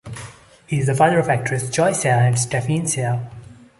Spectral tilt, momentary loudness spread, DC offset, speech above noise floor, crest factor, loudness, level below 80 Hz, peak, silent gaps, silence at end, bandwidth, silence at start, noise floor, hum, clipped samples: -5 dB/octave; 18 LU; under 0.1%; 22 dB; 16 dB; -19 LUFS; -52 dBFS; -2 dBFS; none; 0.25 s; 12 kHz; 0.05 s; -40 dBFS; none; under 0.1%